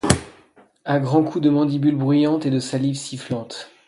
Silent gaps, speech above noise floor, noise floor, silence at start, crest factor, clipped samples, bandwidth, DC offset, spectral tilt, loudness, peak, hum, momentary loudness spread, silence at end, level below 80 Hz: none; 33 dB; -53 dBFS; 0.05 s; 20 dB; under 0.1%; 11.5 kHz; under 0.1%; -6 dB/octave; -20 LUFS; 0 dBFS; none; 11 LU; 0.2 s; -44 dBFS